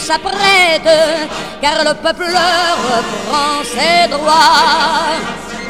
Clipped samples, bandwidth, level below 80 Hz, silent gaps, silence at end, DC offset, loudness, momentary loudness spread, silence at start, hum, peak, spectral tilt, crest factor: 0.1%; 18.5 kHz; -44 dBFS; none; 0 s; 1%; -12 LUFS; 8 LU; 0 s; none; 0 dBFS; -2 dB/octave; 12 dB